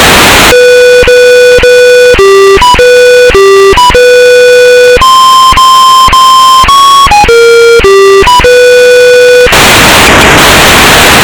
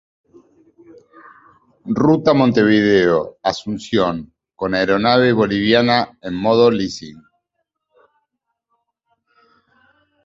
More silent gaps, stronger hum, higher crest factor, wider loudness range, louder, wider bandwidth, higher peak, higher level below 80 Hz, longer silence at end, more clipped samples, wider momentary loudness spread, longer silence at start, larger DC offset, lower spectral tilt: neither; neither; second, 0 dB vs 18 dB; second, 1 LU vs 6 LU; first, 0 LUFS vs -16 LUFS; first, over 20 kHz vs 7.8 kHz; about the same, 0 dBFS vs -2 dBFS; first, -18 dBFS vs -52 dBFS; second, 0 s vs 3.1 s; first, 40% vs under 0.1%; second, 1 LU vs 12 LU; second, 0 s vs 1.85 s; neither; second, -2.5 dB/octave vs -6 dB/octave